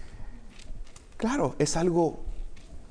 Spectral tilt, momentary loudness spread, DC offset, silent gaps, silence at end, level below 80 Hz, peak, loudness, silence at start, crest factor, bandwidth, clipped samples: -5.5 dB/octave; 23 LU; under 0.1%; none; 0 s; -40 dBFS; -12 dBFS; -27 LUFS; 0 s; 18 dB; 10.5 kHz; under 0.1%